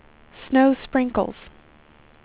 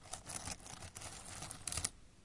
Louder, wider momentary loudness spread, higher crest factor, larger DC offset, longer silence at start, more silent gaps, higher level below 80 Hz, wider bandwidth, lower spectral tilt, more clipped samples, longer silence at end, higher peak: first, -21 LUFS vs -44 LUFS; about the same, 11 LU vs 9 LU; second, 18 dB vs 32 dB; neither; first, 0.4 s vs 0 s; neither; first, -50 dBFS vs -60 dBFS; second, 4 kHz vs 11.5 kHz; first, -10 dB/octave vs -1.5 dB/octave; neither; first, 0.95 s vs 0 s; first, -6 dBFS vs -16 dBFS